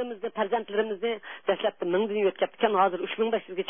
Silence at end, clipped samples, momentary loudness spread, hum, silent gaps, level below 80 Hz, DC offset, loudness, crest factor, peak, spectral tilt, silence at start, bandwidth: 0 s; under 0.1%; 7 LU; none; none; -84 dBFS; 0.2%; -28 LUFS; 18 dB; -10 dBFS; -9 dB/octave; 0 s; 3.7 kHz